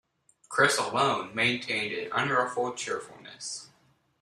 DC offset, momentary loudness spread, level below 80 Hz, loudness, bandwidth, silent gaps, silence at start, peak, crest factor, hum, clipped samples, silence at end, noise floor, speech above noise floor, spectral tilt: under 0.1%; 14 LU; -72 dBFS; -28 LUFS; 14 kHz; none; 0.5 s; -8 dBFS; 22 dB; none; under 0.1%; 0.55 s; -53 dBFS; 24 dB; -3 dB/octave